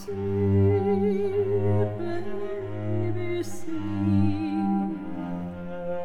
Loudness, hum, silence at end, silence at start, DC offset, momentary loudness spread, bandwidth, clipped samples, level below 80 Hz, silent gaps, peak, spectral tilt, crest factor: -27 LUFS; none; 0 s; 0 s; under 0.1%; 11 LU; 10.5 kHz; under 0.1%; -52 dBFS; none; -12 dBFS; -9 dB/octave; 14 dB